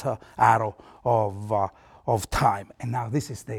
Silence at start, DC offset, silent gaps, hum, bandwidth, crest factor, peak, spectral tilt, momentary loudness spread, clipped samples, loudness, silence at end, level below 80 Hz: 0 s; under 0.1%; none; none; 17.5 kHz; 22 dB; -4 dBFS; -6 dB/octave; 11 LU; under 0.1%; -25 LUFS; 0 s; -46 dBFS